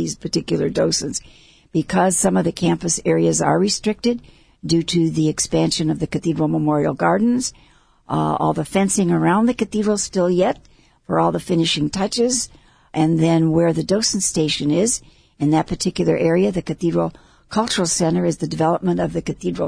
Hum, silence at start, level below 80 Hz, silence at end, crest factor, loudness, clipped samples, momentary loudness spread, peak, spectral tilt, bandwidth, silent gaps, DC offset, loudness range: none; 0 s; -46 dBFS; 0 s; 16 dB; -19 LUFS; under 0.1%; 7 LU; -4 dBFS; -5 dB/octave; 11 kHz; none; under 0.1%; 2 LU